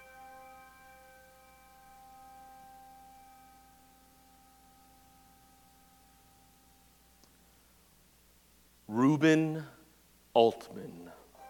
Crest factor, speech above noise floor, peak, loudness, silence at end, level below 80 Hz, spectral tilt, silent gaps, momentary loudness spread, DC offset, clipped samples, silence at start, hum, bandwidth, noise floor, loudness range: 28 dB; 35 dB; -10 dBFS; -29 LUFS; 0 s; -70 dBFS; -6.5 dB/octave; none; 30 LU; under 0.1%; under 0.1%; 8.9 s; 60 Hz at -70 dBFS; 18 kHz; -64 dBFS; 25 LU